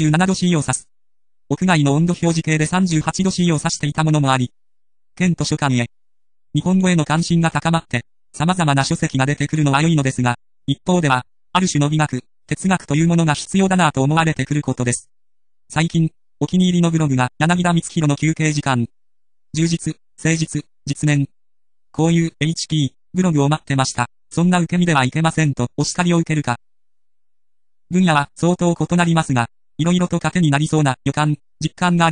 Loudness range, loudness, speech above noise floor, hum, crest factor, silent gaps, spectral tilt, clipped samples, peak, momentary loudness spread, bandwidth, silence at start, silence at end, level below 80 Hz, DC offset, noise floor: 3 LU; -18 LUFS; over 73 dB; none; 18 dB; none; -5.5 dB/octave; under 0.1%; 0 dBFS; 8 LU; 10.5 kHz; 0 s; 0 s; -48 dBFS; 0.2%; under -90 dBFS